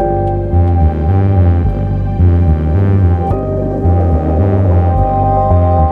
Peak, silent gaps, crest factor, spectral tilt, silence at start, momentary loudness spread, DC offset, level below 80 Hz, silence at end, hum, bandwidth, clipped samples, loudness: 0 dBFS; none; 10 dB; -11.5 dB/octave; 0 s; 5 LU; under 0.1%; -18 dBFS; 0 s; none; 3.3 kHz; under 0.1%; -12 LUFS